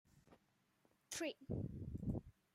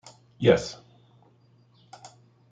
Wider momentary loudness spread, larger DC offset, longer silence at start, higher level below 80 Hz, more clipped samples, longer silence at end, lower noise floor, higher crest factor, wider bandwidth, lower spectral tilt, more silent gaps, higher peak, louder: second, 4 LU vs 27 LU; neither; second, 0.15 s vs 0.4 s; about the same, -62 dBFS vs -60 dBFS; neither; second, 0.25 s vs 1.75 s; first, -79 dBFS vs -60 dBFS; second, 18 dB vs 24 dB; first, 16 kHz vs 9.2 kHz; about the same, -5 dB/octave vs -6 dB/octave; neither; second, -30 dBFS vs -6 dBFS; second, -47 LUFS vs -24 LUFS